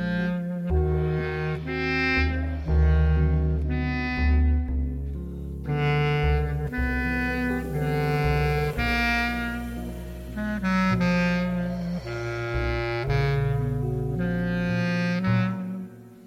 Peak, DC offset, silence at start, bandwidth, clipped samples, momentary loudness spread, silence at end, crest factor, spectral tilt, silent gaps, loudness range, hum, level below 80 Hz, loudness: -10 dBFS; under 0.1%; 0 s; 15 kHz; under 0.1%; 9 LU; 0 s; 14 dB; -7.5 dB/octave; none; 2 LU; none; -30 dBFS; -26 LUFS